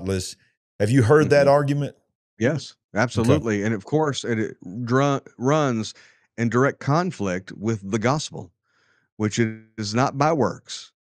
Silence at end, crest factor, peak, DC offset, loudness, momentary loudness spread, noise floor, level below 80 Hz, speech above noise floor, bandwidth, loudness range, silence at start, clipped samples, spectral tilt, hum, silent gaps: 0.2 s; 20 dB; -4 dBFS; under 0.1%; -22 LUFS; 14 LU; -65 dBFS; -58 dBFS; 43 dB; 12.5 kHz; 5 LU; 0 s; under 0.1%; -6 dB/octave; none; 0.57-0.79 s, 2.15-2.37 s, 2.84-2.89 s, 9.12-9.17 s